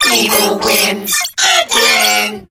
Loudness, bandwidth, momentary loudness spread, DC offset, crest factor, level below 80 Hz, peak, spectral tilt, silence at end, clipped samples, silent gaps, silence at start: -10 LUFS; 18.5 kHz; 5 LU; under 0.1%; 12 dB; -48 dBFS; 0 dBFS; -0.5 dB/octave; 0.1 s; under 0.1%; none; 0 s